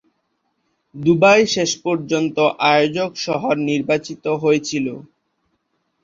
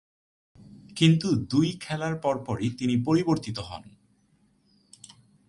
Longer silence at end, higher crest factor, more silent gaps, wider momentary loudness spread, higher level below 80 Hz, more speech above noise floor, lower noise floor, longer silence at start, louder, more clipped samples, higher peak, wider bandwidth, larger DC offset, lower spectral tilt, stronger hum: second, 1 s vs 1.65 s; about the same, 18 dB vs 22 dB; neither; second, 11 LU vs 14 LU; about the same, -60 dBFS vs -58 dBFS; first, 52 dB vs 40 dB; first, -70 dBFS vs -65 dBFS; first, 0.95 s vs 0.6 s; first, -18 LUFS vs -26 LUFS; neither; first, -2 dBFS vs -6 dBFS; second, 7.8 kHz vs 11.5 kHz; neither; second, -4.5 dB/octave vs -6.5 dB/octave; neither